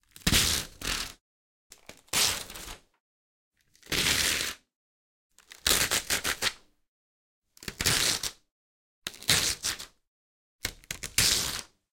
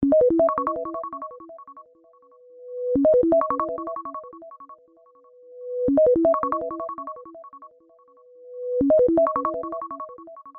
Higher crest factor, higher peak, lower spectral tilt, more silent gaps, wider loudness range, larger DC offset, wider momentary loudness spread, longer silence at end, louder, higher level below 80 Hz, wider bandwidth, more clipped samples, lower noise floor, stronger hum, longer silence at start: first, 28 dB vs 16 dB; first, -4 dBFS vs -8 dBFS; second, -1 dB/octave vs -11.5 dB/octave; first, 1.21-1.70 s, 3.00-3.51 s, 4.76-5.30 s, 6.88-7.42 s, 8.51-9.02 s, 10.08-10.59 s vs none; about the same, 3 LU vs 1 LU; neither; second, 17 LU vs 24 LU; first, 0.3 s vs 0 s; second, -27 LUFS vs -22 LUFS; first, -48 dBFS vs -54 dBFS; first, 17 kHz vs 2.6 kHz; neither; first, under -90 dBFS vs -55 dBFS; neither; first, 0.25 s vs 0 s